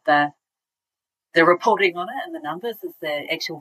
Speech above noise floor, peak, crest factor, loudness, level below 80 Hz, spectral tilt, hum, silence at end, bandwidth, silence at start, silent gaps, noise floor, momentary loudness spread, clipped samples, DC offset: 68 dB; -2 dBFS; 20 dB; -22 LUFS; -82 dBFS; -4.5 dB/octave; none; 0 s; 15.5 kHz; 0.05 s; none; -89 dBFS; 13 LU; under 0.1%; under 0.1%